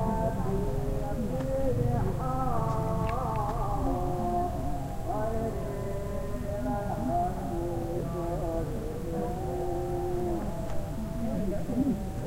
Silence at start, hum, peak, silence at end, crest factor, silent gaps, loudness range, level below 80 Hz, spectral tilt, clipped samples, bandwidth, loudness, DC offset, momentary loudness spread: 0 s; none; -16 dBFS; 0 s; 14 dB; none; 3 LU; -36 dBFS; -8 dB/octave; under 0.1%; 16 kHz; -32 LUFS; under 0.1%; 5 LU